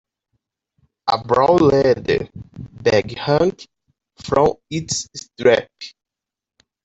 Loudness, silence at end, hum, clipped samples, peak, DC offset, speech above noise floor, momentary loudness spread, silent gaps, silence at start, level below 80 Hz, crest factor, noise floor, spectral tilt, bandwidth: -18 LUFS; 0.95 s; none; under 0.1%; -2 dBFS; under 0.1%; 56 dB; 22 LU; none; 1.05 s; -48 dBFS; 18 dB; -74 dBFS; -5 dB/octave; 8.4 kHz